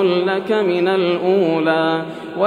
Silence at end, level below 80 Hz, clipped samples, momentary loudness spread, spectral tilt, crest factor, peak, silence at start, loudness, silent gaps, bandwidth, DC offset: 0 s; -72 dBFS; under 0.1%; 4 LU; -7 dB/octave; 14 dB; -2 dBFS; 0 s; -17 LUFS; none; 9.8 kHz; under 0.1%